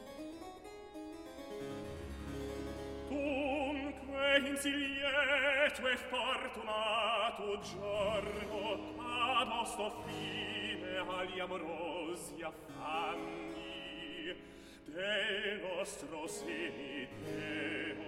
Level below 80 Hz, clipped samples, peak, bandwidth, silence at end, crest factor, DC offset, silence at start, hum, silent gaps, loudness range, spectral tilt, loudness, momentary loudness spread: -60 dBFS; under 0.1%; -16 dBFS; 16 kHz; 0 s; 22 dB; under 0.1%; 0 s; none; none; 8 LU; -3.5 dB/octave; -37 LUFS; 15 LU